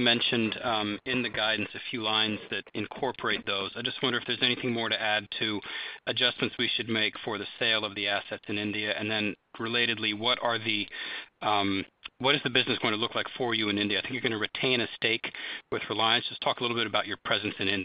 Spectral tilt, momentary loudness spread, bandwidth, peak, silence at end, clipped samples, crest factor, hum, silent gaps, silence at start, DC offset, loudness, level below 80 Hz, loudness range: -8 dB/octave; 8 LU; 5.4 kHz; -10 dBFS; 0 s; under 0.1%; 20 dB; none; none; 0 s; under 0.1%; -28 LUFS; -68 dBFS; 2 LU